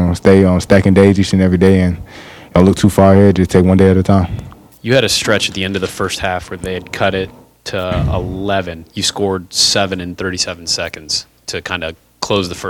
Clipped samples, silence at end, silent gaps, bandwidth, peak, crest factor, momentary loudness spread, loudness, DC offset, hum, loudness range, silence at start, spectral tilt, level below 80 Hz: 0.2%; 0 s; none; 15 kHz; 0 dBFS; 14 dB; 14 LU; -13 LUFS; under 0.1%; none; 8 LU; 0 s; -5 dB/octave; -34 dBFS